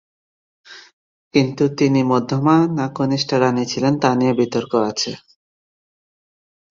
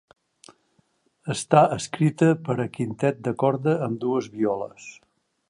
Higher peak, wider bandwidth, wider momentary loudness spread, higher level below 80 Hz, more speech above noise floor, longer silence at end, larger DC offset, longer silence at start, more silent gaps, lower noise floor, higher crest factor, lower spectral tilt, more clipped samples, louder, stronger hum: about the same, -2 dBFS vs -2 dBFS; second, 7.6 kHz vs 11 kHz; second, 5 LU vs 13 LU; about the same, -60 dBFS vs -64 dBFS; first, over 73 dB vs 44 dB; first, 1.55 s vs 0.55 s; neither; second, 0.7 s vs 1.25 s; first, 0.93-1.31 s vs none; first, under -90 dBFS vs -67 dBFS; about the same, 18 dB vs 22 dB; about the same, -6 dB/octave vs -6.5 dB/octave; neither; first, -18 LUFS vs -23 LUFS; neither